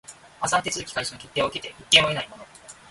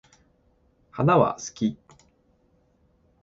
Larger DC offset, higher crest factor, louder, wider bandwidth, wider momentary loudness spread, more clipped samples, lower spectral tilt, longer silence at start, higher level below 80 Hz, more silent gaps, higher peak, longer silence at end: neither; about the same, 24 dB vs 24 dB; about the same, -22 LUFS vs -24 LUFS; first, 12 kHz vs 7.8 kHz; second, 14 LU vs 21 LU; neither; second, -1.5 dB/octave vs -6.5 dB/octave; second, 0.1 s vs 0.95 s; about the same, -56 dBFS vs -60 dBFS; neither; about the same, -2 dBFS vs -4 dBFS; second, 0.2 s vs 1.5 s